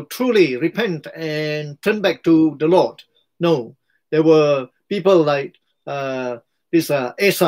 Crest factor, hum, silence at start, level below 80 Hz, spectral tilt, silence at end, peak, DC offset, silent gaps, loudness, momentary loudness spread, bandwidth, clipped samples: 16 dB; none; 0 s; -66 dBFS; -6 dB/octave; 0 s; -2 dBFS; under 0.1%; none; -18 LUFS; 12 LU; 16 kHz; under 0.1%